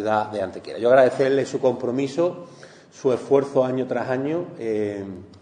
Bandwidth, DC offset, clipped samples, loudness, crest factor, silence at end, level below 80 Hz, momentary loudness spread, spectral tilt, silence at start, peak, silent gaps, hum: 10 kHz; under 0.1%; under 0.1%; -22 LUFS; 18 dB; 0.05 s; -68 dBFS; 12 LU; -6.5 dB/octave; 0 s; -4 dBFS; none; none